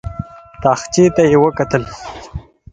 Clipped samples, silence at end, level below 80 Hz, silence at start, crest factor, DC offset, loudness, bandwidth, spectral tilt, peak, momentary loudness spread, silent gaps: under 0.1%; 0.3 s; -38 dBFS; 0.05 s; 16 dB; under 0.1%; -14 LUFS; 9.2 kHz; -6 dB/octave; 0 dBFS; 21 LU; none